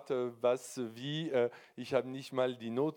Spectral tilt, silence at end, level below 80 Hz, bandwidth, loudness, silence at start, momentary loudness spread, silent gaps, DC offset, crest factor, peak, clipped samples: -5.5 dB/octave; 0 s; -84 dBFS; 17.5 kHz; -35 LUFS; 0 s; 7 LU; none; under 0.1%; 18 dB; -16 dBFS; under 0.1%